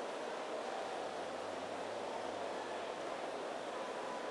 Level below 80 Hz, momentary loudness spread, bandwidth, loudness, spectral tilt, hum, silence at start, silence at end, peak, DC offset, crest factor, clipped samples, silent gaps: -82 dBFS; 1 LU; 12 kHz; -43 LUFS; -3 dB/octave; none; 0 s; 0 s; -30 dBFS; under 0.1%; 14 dB; under 0.1%; none